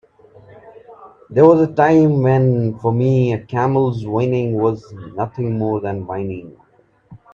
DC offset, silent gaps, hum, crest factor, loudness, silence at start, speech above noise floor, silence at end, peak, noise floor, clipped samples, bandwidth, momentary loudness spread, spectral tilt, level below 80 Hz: under 0.1%; none; none; 18 dB; -17 LUFS; 0.65 s; 32 dB; 0.15 s; 0 dBFS; -48 dBFS; under 0.1%; 7 kHz; 13 LU; -9.5 dB/octave; -54 dBFS